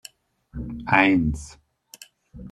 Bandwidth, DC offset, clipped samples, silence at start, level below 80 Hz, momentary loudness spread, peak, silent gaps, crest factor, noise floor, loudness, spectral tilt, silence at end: 13.5 kHz; under 0.1%; under 0.1%; 0.55 s; -42 dBFS; 25 LU; -2 dBFS; none; 24 dB; -52 dBFS; -20 LUFS; -5.5 dB/octave; 0 s